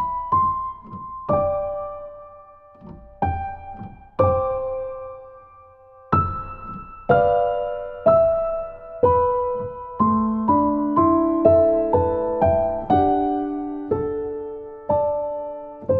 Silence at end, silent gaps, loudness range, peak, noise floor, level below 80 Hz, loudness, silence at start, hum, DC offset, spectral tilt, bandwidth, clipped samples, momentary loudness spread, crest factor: 0 s; none; 8 LU; -2 dBFS; -48 dBFS; -44 dBFS; -21 LUFS; 0 s; none; under 0.1%; -11.5 dB/octave; 4.3 kHz; under 0.1%; 17 LU; 20 dB